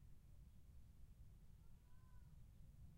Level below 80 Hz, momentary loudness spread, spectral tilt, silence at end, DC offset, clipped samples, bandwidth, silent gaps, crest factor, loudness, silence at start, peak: -66 dBFS; 2 LU; -6.5 dB/octave; 0 s; under 0.1%; under 0.1%; 16 kHz; none; 10 dB; -68 LUFS; 0 s; -52 dBFS